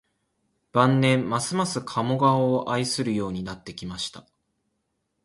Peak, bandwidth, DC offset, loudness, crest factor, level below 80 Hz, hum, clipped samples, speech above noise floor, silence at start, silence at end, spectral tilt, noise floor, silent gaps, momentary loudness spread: -6 dBFS; 11.5 kHz; under 0.1%; -24 LUFS; 20 dB; -58 dBFS; none; under 0.1%; 52 dB; 0.75 s; 1.05 s; -5.5 dB/octave; -76 dBFS; none; 13 LU